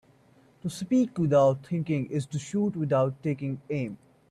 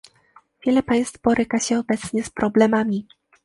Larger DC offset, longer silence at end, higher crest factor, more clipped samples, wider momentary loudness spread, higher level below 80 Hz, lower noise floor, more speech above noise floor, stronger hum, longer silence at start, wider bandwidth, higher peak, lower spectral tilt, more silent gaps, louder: neither; about the same, 0.35 s vs 0.45 s; about the same, 16 dB vs 18 dB; neither; first, 14 LU vs 8 LU; second, -66 dBFS vs -52 dBFS; first, -60 dBFS vs -55 dBFS; about the same, 33 dB vs 35 dB; neither; about the same, 0.65 s vs 0.65 s; about the same, 12.5 kHz vs 11.5 kHz; second, -12 dBFS vs -4 dBFS; first, -7.5 dB/octave vs -5 dB/octave; neither; second, -28 LUFS vs -21 LUFS